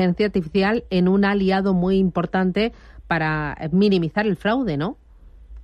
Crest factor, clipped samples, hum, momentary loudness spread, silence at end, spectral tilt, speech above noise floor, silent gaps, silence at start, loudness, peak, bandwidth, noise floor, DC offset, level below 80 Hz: 12 dB; under 0.1%; none; 7 LU; 0 s; -8.5 dB/octave; 24 dB; none; 0 s; -21 LUFS; -8 dBFS; 5.8 kHz; -44 dBFS; under 0.1%; -42 dBFS